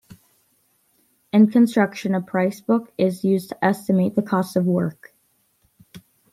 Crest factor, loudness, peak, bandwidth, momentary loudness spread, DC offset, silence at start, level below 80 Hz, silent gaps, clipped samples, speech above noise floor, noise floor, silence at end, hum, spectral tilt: 18 dB; -20 LUFS; -4 dBFS; 15 kHz; 7 LU; under 0.1%; 1.35 s; -66 dBFS; none; under 0.1%; 45 dB; -65 dBFS; 0.35 s; none; -7.5 dB/octave